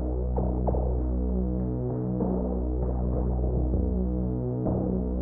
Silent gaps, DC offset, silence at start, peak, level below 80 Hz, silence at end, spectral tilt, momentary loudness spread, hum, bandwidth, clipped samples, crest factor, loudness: none; under 0.1%; 0 s; -14 dBFS; -30 dBFS; 0 s; -12 dB/octave; 2 LU; none; 1.8 kHz; under 0.1%; 12 dB; -29 LUFS